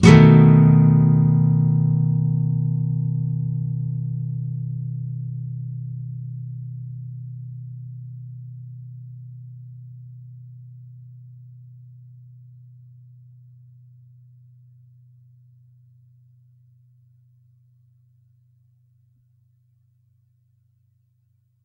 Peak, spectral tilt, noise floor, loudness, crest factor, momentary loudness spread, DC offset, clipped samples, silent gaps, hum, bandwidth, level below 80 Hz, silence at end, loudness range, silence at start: 0 dBFS; -8.5 dB/octave; -64 dBFS; -19 LUFS; 22 dB; 28 LU; under 0.1%; under 0.1%; none; none; 8.4 kHz; -50 dBFS; 10.75 s; 27 LU; 0 s